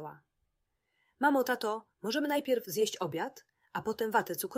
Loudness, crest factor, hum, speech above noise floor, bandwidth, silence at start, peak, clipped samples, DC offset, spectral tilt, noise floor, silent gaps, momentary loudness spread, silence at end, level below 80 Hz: -33 LUFS; 20 dB; none; 49 dB; 16 kHz; 0 s; -14 dBFS; under 0.1%; under 0.1%; -3.5 dB/octave; -81 dBFS; none; 10 LU; 0 s; -78 dBFS